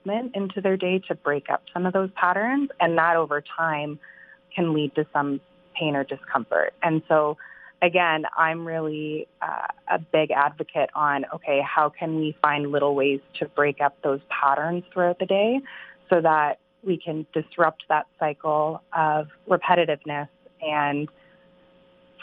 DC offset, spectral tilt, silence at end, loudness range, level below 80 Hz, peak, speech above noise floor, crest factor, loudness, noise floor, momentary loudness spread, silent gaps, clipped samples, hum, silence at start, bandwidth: under 0.1%; -8.5 dB/octave; 0 s; 2 LU; -74 dBFS; -2 dBFS; 32 dB; 22 dB; -24 LUFS; -56 dBFS; 9 LU; none; under 0.1%; none; 0.05 s; 4.6 kHz